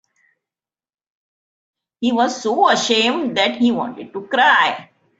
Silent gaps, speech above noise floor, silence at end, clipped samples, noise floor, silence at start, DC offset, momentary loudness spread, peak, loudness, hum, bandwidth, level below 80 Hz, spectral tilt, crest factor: none; over 73 dB; 0.35 s; under 0.1%; under -90 dBFS; 2 s; under 0.1%; 11 LU; -2 dBFS; -17 LUFS; none; 8 kHz; -66 dBFS; -2.5 dB/octave; 18 dB